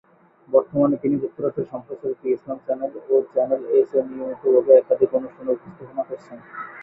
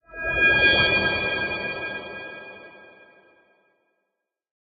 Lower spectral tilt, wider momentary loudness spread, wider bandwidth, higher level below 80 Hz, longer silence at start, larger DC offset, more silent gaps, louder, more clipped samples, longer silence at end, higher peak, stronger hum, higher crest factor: first, -11 dB/octave vs -6 dB/octave; second, 15 LU vs 21 LU; second, 2.9 kHz vs 7.2 kHz; second, -66 dBFS vs -48 dBFS; first, 0.5 s vs 0.1 s; neither; neither; about the same, -21 LUFS vs -20 LUFS; neither; second, 0 s vs 1.8 s; first, -2 dBFS vs -6 dBFS; neither; about the same, 20 dB vs 20 dB